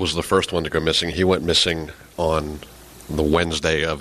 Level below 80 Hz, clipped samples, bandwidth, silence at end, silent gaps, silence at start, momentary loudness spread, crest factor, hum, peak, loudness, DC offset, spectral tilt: -38 dBFS; under 0.1%; 14.5 kHz; 0 s; none; 0 s; 12 LU; 18 dB; none; -4 dBFS; -20 LUFS; under 0.1%; -4 dB/octave